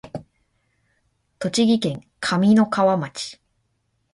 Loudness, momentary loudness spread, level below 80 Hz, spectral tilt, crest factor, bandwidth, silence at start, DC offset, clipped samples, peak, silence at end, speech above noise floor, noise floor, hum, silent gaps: -20 LUFS; 16 LU; -60 dBFS; -5.5 dB/octave; 16 dB; 11.5 kHz; 0.05 s; under 0.1%; under 0.1%; -6 dBFS; 0.8 s; 51 dB; -70 dBFS; none; none